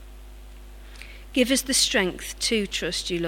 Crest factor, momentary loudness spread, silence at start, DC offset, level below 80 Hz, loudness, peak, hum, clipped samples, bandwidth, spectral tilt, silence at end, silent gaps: 18 dB; 22 LU; 0 s; under 0.1%; -42 dBFS; -23 LUFS; -8 dBFS; 50 Hz at -45 dBFS; under 0.1%; 17.5 kHz; -2 dB/octave; 0 s; none